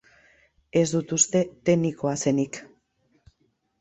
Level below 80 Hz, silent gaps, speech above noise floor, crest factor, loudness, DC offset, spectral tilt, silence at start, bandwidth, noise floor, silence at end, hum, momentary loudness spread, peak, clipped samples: -62 dBFS; none; 47 dB; 20 dB; -24 LUFS; under 0.1%; -5 dB/octave; 0.75 s; 8.4 kHz; -70 dBFS; 1.15 s; none; 6 LU; -6 dBFS; under 0.1%